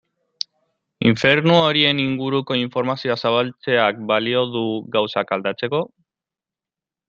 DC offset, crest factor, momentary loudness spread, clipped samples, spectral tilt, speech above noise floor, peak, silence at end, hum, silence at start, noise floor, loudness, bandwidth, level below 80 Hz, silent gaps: under 0.1%; 20 dB; 10 LU; under 0.1%; -6 dB/octave; 70 dB; -2 dBFS; 1.2 s; none; 1 s; -89 dBFS; -19 LUFS; 7.6 kHz; -58 dBFS; none